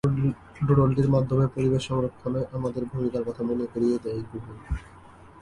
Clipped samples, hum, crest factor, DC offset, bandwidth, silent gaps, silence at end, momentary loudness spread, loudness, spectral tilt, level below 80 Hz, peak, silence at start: under 0.1%; none; 16 dB; under 0.1%; 10.5 kHz; none; 0.15 s; 14 LU; -26 LUFS; -8.5 dB/octave; -44 dBFS; -8 dBFS; 0.05 s